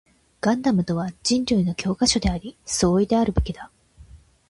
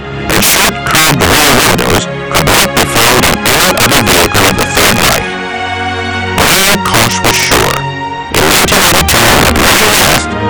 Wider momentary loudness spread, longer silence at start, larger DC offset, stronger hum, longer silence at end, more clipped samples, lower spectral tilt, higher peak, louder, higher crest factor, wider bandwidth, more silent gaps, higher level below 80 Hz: about the same, 7 LU vs 9 LU; first, 0.45 s vs 0 s; neither; neither; first, 0.35 s vs 0 s; second, under 0.1% vs 0.6%; first, -5 dB/octave vs -2.5 dB/octave; second, -6 dBFS vs 0 dBFS; second, -22 LUFS vs -7 LUFS; first, 18 dB vs 8 dB; second, 11.5 kHz vs over 20 kHz; neither; second, -36 dBFS vs -26 dBFS